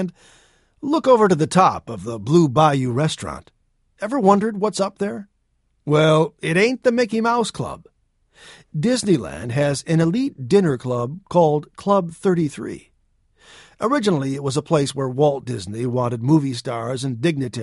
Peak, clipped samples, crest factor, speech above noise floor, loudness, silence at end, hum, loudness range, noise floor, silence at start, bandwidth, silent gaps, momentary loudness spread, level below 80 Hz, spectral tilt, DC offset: -2 dBFS; under 0.1%; 18 dB; 47 dB; -20 LUFS; 0 s; none; 4 LU; -66 dBFS; 0 s; 11.5 kHz; none; 13 LU; -54 dBFS; -6 dB/octave; under 0.1%